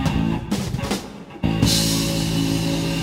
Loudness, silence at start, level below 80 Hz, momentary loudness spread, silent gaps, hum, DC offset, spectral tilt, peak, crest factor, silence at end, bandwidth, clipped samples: -21 LUFS; 0 s; -34 dBFS; 9 LU; none; none; under 0.1%; -4.5 dB/octave; -2 dBFS; 18 dB; 0 s; 16.5 kHz; under 0.1%